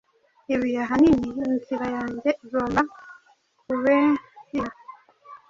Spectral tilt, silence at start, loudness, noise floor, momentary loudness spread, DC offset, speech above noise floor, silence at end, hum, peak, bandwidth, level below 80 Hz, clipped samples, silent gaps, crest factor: -7 dB/octave; 0.5 s; -24 LUFS; -62 dBFS; 11 LU; under 0.1%; 40 dB; 0.15 s; none; -6 dBFS; 7.6 kHz; -52 dBFS; under 0.1%; none; 18 dB